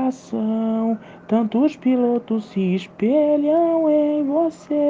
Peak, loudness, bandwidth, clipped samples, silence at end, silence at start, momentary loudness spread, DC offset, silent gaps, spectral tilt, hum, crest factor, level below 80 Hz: -6 dBFS; -20 LUFS; 7.6 kHz; under 0.1%; 0 s; 0 s; 6 LU; under 0.1%; none; -8.5 dB/octave; none; 14 dB; -66 dBFS